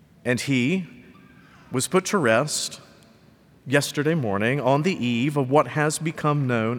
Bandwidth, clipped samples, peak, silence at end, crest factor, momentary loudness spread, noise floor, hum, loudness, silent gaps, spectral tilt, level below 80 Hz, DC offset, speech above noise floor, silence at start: 19.5 kHz; under 0.1%; -4 dBFS; 0 s; 20 dB; 8 LU; -54 dBFS; none; -23 LUFS; none; -5 dB/octave; -66 dBFS; under 0.1%; 32 dB; 0.25 s